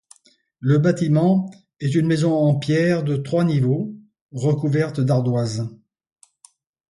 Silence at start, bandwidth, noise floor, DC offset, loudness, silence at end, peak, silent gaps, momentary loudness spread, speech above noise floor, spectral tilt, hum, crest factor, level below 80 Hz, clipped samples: 0.6 s; 11.5 kHz; -55 dBFS; under 0.1%; -20 LUFS; 1.15 s; -6 dBFS; 4.21-4.29 s; 10 LU; 37 dB; -7.5 dB/octave; none; 16 dB; -60 dBFS; under 0.1%